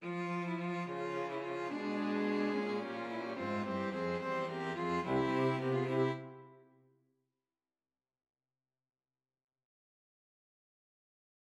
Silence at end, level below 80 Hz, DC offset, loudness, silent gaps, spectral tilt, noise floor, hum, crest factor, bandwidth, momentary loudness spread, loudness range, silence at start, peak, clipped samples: 5 s; -74 dBFS; under 0.1%; -37 LUFS; none; -7 dB/octave; under -90 dBFS; none; 18 dB; 11.5 kHz; 6 LU; 5 LU; 0 s; -20 dBFS; under 0.1%